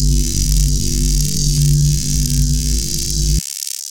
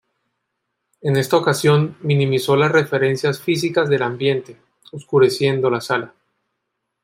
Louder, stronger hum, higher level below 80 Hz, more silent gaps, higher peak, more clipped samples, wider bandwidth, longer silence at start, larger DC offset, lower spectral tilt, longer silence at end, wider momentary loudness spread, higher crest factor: about the same, -17 LUFS vs -18 LUFS; neither; first, -18 dBFS vs -62 dBFS; neither; about the same, 0 dBFS vs -2 dBFS; neither; about the same, 17.5 kHz vs 16 kHz; second, 0 s vs 1.05 s; first, 2% vs under 0.1%; second, -4 dB/octave vs -6 dB/octave; second, 0 s vs 0.95 s; second, 4 LU vs 8 LU; about the same, 16 dB vs 16 dB